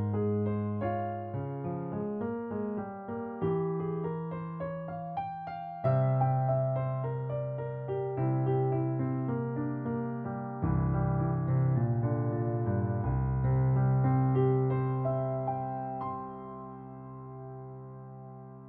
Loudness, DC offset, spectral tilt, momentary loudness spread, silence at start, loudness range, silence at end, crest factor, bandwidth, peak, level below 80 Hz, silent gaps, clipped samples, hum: -32 LUFS; under 0.1%; -10.5 dB/octave; 16 LU; 0 s; 6 LU; 0 s; 14 dB; 3.4 kHz; -16 dBFS; -50 dBFS; none; under 0.1%; none